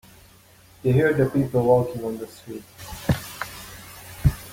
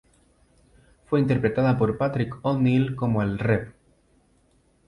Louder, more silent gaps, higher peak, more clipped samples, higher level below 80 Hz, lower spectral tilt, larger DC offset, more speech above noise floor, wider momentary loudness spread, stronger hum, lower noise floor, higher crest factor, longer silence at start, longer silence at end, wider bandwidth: about the same, -23 LUFS vs -24 LUFS; neither; first, -4 dBFS vs -8 dBFS; neither; first, -38 dBFS vs -50 dBFS; second, -7 dB/octave vs -9.5 dB/octave; neither; second, 30 dB vs 40 dB; first, 19 LU vs 5 LU; neither; second, -52 dBFS vs -63 dBFS; about the same, 20 dB vs 16 dB; second, 0.85 s vs 1.1 s; second, 0 s vs 1.2 s; first, 17 kHz vs 10.5 kHz